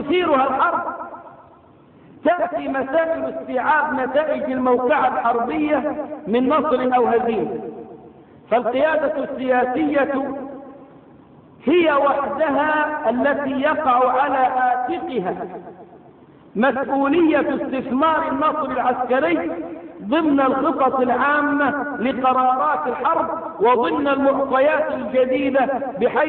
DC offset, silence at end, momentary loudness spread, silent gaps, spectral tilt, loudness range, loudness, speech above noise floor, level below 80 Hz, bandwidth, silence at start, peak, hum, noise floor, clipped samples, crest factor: under 0.1%; 0 s; 9 LU; none; -9.5 dB/octave; 3 LU; -19 LUFS; 30 dB; -56 dBFS; 4.3 kHz; 0 s; -6 dBFS; none; -48 dBFS; under 0.1%; 14 dB